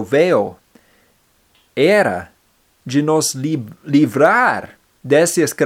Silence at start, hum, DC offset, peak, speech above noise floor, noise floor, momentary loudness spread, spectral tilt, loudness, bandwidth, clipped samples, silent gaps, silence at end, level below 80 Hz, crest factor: 0 s; none; under 0.1%; 0 dBFS; 44 dB; -59 dBFS; 14 LU; -4.5 dB/octave; -16 LUFS; 16.5 kHz; under 0.1%; none; 0 s; -60 dBFS; 16 dB